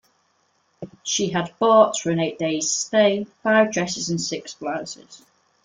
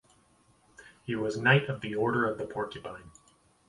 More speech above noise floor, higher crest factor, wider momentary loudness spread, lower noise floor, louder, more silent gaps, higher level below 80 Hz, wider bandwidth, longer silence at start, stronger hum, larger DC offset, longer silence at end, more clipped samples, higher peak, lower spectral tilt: first, 45 dB vs 35 dB; about the same, 20 dB vs 24 dB; second, 16 LU vs 20 LU; about the same, -66 dBFS vs -65 dBFS; first, -21 LUFS vs -29 LUFS; neither; about the same, -66 dBFS vs -64 dBFS; second, 9.6 kHz vs 11.5 kHz; about the same, 0.8 s vs 0.8 s; neither; neither; about the same, 0.5 s vs 0.6 s; neither; first, -2 dBFS vs -8 dBFS; second, -3.5 dB/octave vs -6.5 dB/octave